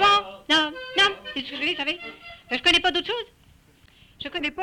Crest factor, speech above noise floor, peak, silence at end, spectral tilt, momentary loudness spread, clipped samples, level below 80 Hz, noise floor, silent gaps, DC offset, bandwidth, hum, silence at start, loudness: 16 dB; 30 dB; -8 dBFS; 0 s; -2 dB/octave; 16 LU; under 0.1%; -54 dBFS; -56 dBFS; none; under 0.1%; 16.5 kHz; none; 0 s; -23 LUFS